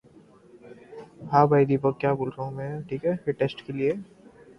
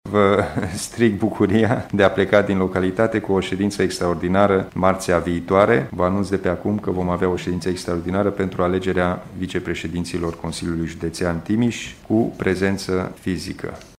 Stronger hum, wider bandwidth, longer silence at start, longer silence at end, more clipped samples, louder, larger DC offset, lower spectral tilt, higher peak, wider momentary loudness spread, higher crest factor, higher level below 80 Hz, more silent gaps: neither; second, 6.2 kHz vs 15.5 kHz; first, 0.65 s vs 0.05 s; first, 0.55 s vs 0.1 s; neither; second, -25 LUFS vs -21 LUFS; neither; first, -9 dB/octave vs -6 dB/octave; second, -4 dBFS vs 0 dBFS; first, 20 LU vs 9 LU; about the same, 22 dB vs 20 dB; second, -62 dBFS vs -44 dBFS; neither